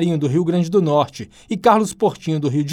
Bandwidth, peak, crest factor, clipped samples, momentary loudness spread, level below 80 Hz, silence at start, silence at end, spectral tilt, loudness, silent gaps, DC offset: 14 kHz; -2 dBFS; 16 dB; under 0.1%; 9 LU; -56 dBFS; 0 s; 0 s; -7 dB/octave; -18 LUFS; none; under 0.1%